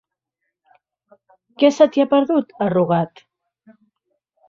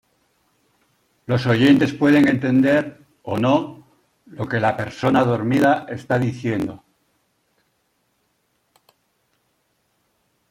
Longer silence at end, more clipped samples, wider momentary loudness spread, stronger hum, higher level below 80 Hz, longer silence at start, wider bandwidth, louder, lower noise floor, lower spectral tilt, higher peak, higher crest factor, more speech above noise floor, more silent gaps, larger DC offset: second, 1.4 s vs 3.75 s; neither; second, 7 LU vs 14 LU; neither; about the same, -64 dBFS vs -60 dBFS; first, 1.6 s vs 1.3 s; second, 7.6 kHz vs 14 kHz; about the same, -17 LUFS vs -19 LUFS; first, -78 dBFS vs -68 dBFS; about the same, -7 dB/octave vs -7 dB/octave; about the same, -2 dBFS vs -2 dBFS; about the same, 18 dB vs 18 dB; first, 62 dB vs 50 dB; neither; neither